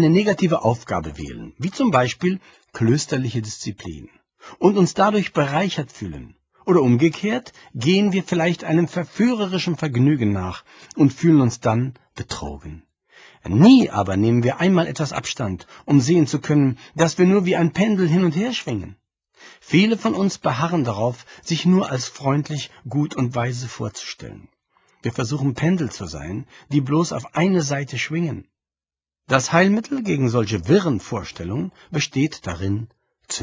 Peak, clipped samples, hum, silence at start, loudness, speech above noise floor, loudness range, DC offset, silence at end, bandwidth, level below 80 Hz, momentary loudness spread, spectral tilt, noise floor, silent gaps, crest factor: 0 dBFS; under 0.1%; none; 0 s; -20 LUFS; over 70 dB; 5 LU; under 0.1%; 0 s; 7.8 kHz; -48 dBFS; 15 LU; -6 dB/octave; under -90 dBFS; none; 20 dB